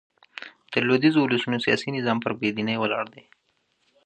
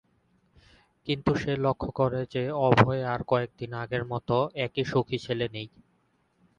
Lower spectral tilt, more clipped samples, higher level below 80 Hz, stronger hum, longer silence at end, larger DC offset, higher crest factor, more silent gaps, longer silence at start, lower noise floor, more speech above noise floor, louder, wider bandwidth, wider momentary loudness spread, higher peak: about the same, -6 dB/octave vs -7 dB/octave; neither; second, -68 dBFS vs -54 dBFS; neither; about the same, 0.85 s vs 0.9 s; neither; second, 20 dB vs 26 dB; neither; second, 0.4 s vs 1.05 s; about the same, -70 dBFS vs -70 dBFS; first, 47 dB vs 42 dB; first, -24 LUFS vs -28 LUFS; about the same, 9.2 kHz vs 8.6 kHz; first, 20 LU vs 11 LU; about the same, -6 dBFS vs -4 dBFS